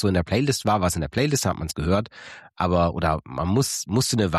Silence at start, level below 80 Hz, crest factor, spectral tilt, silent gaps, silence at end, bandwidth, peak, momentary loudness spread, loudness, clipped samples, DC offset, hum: 0 s; -40 dBFS; 14 dB; -5 dB/octave; none; 0 s; 14 kHz; -8 dBFS; 6 LU; -23 LUFS; under 0.1%; under 0.1%; none